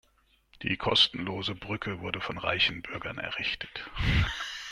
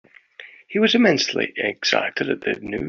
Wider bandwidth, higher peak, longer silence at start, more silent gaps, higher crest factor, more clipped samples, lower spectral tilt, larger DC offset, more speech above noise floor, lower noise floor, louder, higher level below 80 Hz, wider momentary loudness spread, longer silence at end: first, 13.5 kHz vs 7.4 kHz; second, -10 dBFS vs -4 dBFS; first, 0.6 s vs 0.4 s; neither; about the same, 22 dB vs 18 dB; neither; about the same, -4.5 dB/octave vs -3.5 dB/octave; neither; first, 37 dB vs 24 dB; first, -67 dBFS vs -45 dBFS; second, -29 LUFS vs -20 LUFS; first, -42 dBFS vs -58 dBFS; first, 13 LU vs 9 LU; about the same, 0 s vs 0 s